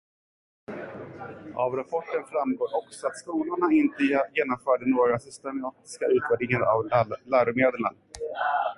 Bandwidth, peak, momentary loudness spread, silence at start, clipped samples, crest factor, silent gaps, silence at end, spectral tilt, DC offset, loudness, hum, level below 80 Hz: 11.5 kHz; -8 dBFS; 15 LU; 0.7 s; under 0.1%; 18 dB; none; 0.05 s; -6.5 dB/octave; under 0.1%; -26 LUFS; none; -62 dBFS